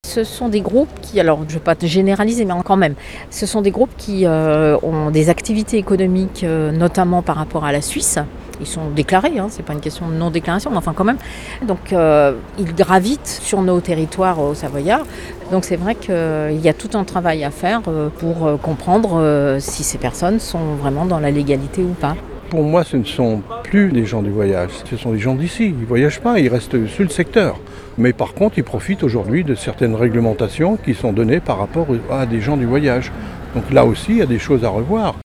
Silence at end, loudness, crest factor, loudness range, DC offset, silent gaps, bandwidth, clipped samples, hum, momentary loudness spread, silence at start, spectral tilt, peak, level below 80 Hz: 0 s; -17 LUFS; 16 dB; 3 LU; under 0.1%; none; 16 kHz; under 0.1%; none; 7 LU; 0.05 s; -6 dB/octave; 0 dBFS; -36 dBFS